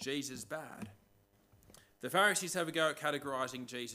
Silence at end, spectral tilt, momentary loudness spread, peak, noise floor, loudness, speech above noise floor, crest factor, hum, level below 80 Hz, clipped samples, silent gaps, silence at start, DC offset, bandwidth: 0 s; -2.5 dB/octave; 18 LU; -16 dBFS; -70 dBFS; -35 LUFS; 33 dB; 22 dB; none; -76 dBFS; under 0.1%; none; 0 s; under 0.1%; 16 kHz